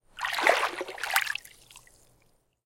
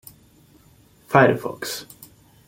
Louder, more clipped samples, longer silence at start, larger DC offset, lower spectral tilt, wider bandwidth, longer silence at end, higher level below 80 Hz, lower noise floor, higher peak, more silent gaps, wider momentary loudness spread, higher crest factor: second, -27 LUFS vs -20 LUFS; neither; second, 0.15 s vs 1.1 s; neither; second, 0 dB/octave vs -5.5 dB/octave; about the same, 17 kHz vs 17 kHz; first, 0.85 s vs 0.65 s; second, -66 dBFS vs -60 dBFS; first, -67 dBFS vs -54 dBFS; about the same, -4 dBFS vs -2 dBFS; neither; second, 12 LU vs 17 LU; first, 28 dB vs 22 dB